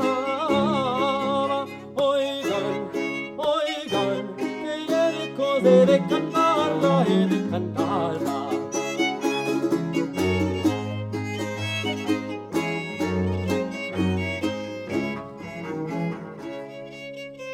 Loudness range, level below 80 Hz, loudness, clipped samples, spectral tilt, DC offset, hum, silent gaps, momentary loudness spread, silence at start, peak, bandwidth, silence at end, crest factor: 7 LU; -60 dBFS; -24 LUFS; under 0.1%; -6 dB/octave; under 0.1%; none; none; 11 LU; 0 s; -6 dBFS; 16 kHz; 0 s; 18 dB